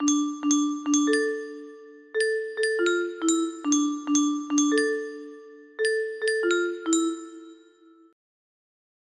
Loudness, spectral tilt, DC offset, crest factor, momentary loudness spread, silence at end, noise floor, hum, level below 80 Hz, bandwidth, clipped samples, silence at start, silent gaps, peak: -25 LUFS; -1 dB/octave; under 0.1%; 16 dB; 18 LU; 1.55 s; -55 dBFS; none; -74 dBFS; 11.5 kHz; under 0.1%; 0 s; none; -10 dBFS